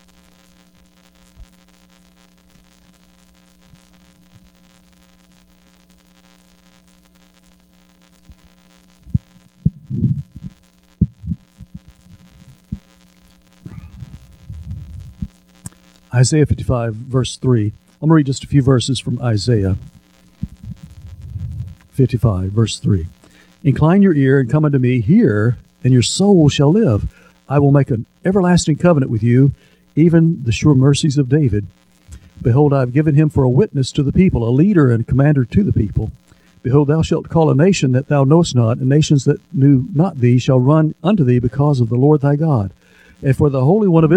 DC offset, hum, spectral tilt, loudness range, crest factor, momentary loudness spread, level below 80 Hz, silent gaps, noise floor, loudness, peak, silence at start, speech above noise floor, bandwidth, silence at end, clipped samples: under 0.1%; none; -7 dB/octave; 15 LU; 16 dB; 19 LU; -38 dBFS; none; -51 dBFS; -15 LUFS; 0 dBFS; 1.4 s; 38 dB; 10.5 kHz; 0 s; under 0.1%